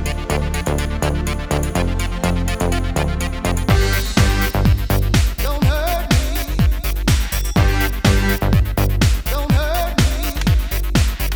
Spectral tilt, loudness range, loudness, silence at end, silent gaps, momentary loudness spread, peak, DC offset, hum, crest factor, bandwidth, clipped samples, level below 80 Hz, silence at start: -5 dB/octave; 2 LU; -18 LUFS; 0 s; none; 5 LU; 0 dBFS; under 0.1%; none; 16 dB; over 20 kHz; under 0.1%; -20 dBFS; 0 s